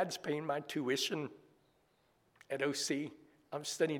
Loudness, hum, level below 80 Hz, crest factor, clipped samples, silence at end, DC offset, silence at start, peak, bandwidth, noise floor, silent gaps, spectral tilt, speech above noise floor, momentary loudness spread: -38 LUFS; none; -84 dBFS; 18 dB; under 0.1%; 0 s; under 0.1%; 0 s; -20 dBFS; 18.5 kHz; -74 dBFS; none; -3.5 dB/octave; 37 dB; 11 LU